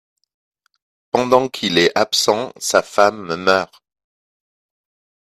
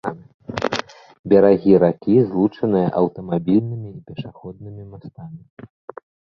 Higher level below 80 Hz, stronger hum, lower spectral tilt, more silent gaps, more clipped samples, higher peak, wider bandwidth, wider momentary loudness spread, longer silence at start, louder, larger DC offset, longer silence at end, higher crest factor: second, -60 dBFS vs -54 dBFS; neither; second, -3 dB/octave vs -8 dB/octave; second, none vs 0.34-0.39 s, 1.19-1.24 s; neither; about the same, 0 dBFS vs -2 dBFS; first, 14.5 kHz vs 7.4 kHz; second, 6 LU vs 24 LU; first, 1.15 s vs 0.05 s; about the same, -17 LUFS vs -18 LUFS; neither; first, 1.6 s vs 0.95 s; about the same, 20 dB vs 18 dB